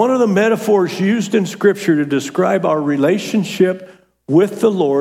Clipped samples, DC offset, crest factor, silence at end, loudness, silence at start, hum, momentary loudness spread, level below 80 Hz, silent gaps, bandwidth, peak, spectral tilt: under 0.1%; under 0.1%; 14 dB; 0 s; -15 LUFS; 0 s; none; 4 LU; -68 dBFS; none; 16.5 kHz; -2 dBFS; -6 dB/octave